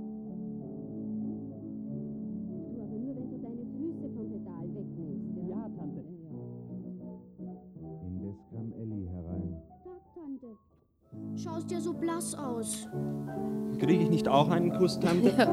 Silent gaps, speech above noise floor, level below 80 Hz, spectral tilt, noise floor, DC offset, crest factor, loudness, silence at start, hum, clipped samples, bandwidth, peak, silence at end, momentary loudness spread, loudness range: none; 38 dB; -62 dBFS; -6 dB/octave; -67 dBFS; under 0.1%; 22 dB; -34 LUFS; 0 s; none; under 0.1%; 15 kHz; -10 dBFS; 0 s; 19 LU; 13 LU